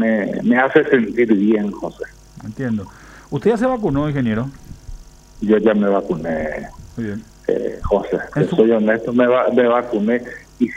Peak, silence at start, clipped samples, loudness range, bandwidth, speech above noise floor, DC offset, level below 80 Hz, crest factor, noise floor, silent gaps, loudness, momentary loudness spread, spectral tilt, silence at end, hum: 0 dBFS; 0 s; under 0.1%; 5 LU; 9.4 kHz; 20 dB; under 0.1%; -40 dBFS; 18 dB; -37 dBFS; none; -18 LUFS; 14 LU; -7.5 dB/octave; 0 s; none